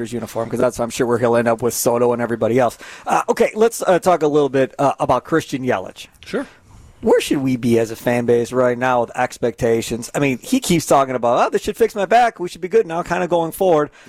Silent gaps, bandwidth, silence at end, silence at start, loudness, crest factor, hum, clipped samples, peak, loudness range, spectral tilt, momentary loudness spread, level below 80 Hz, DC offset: none; 16.5 kHz; 0.2 s; 0 s; -18 LUFS; 14 dB; none; under 0.1%; -4 dBFS; 3 LU; -5 dB/octave; 8 LU; -48 dBFS; under 0.1%